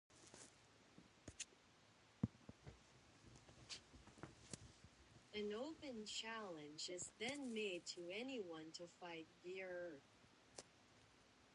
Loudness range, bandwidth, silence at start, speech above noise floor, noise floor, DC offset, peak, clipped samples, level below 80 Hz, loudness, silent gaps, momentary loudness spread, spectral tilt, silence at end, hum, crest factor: 8 LU; 11 kHz; 0.1 s; 20 dB; -72 dBFS; under 0.1%; -26 dBFS; under 0.1%; -76 dBFS; -52 LUFS; none; 19 LU; -3.5 dB/octave; 0 s; none; 28 dB